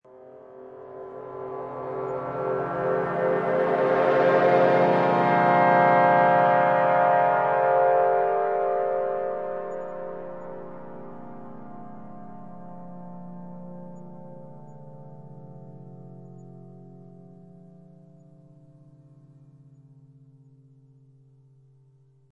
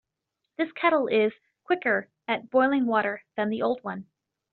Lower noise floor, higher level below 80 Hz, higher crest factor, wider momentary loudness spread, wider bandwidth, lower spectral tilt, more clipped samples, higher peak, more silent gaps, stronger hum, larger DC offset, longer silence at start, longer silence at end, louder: second, -59 dBFS vs -83 dBFS; first, -68 dBFS vs -74 dBFS; about the same, 20 dB vs 18 dB; first, 26 LU vs 9 LU; first, 6 kHz vs 4.5 kHz; first, -8 dB/octave vs -3 dB/octave; neither; about the same, -6 dBFS vs -8 dBFS; neither; neither; neither; second, 0.15 s vs 0.6 s; first, 5.35 s vs 0.5 s; first, -22 LUFS vs -26 LUFS